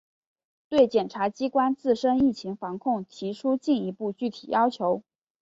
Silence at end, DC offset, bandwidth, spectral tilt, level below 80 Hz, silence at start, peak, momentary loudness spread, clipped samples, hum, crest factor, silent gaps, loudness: 0.4 s; under 0.1%; 7.8 kHz; -6.5 dB/octave; -62 dBFS; 0.7 s; -8 dBFS; 10 LU; under 0.1%; none; 18 dB; none; -26 LUFS